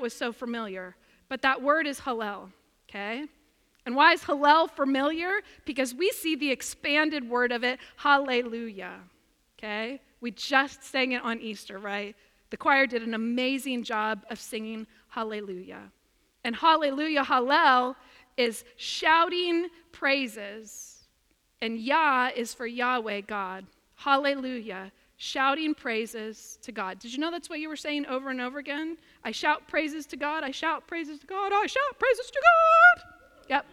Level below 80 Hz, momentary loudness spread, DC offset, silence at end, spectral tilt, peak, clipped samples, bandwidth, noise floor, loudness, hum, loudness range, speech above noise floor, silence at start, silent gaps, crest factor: -66 dBFS; 18 LU; under 0.1%; 0.1 s; -2.5 dB/octave; -6 dBFS; under 0.1%; 16.5 kHz; -69 dBFS; -26 LUFS; none; 7 LU; 42 dB; 0 s; none; 22 dB